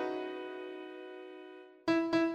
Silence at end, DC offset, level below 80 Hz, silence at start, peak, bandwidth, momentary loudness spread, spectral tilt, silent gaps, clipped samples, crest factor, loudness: 0 s; under 0.1%; -74 dBFS; 0 s; -18 dBFS; 8.2 kHz; 19 LU; -5.5 dB/octave; none; under 0.1%; 18 dB; -36 LUFS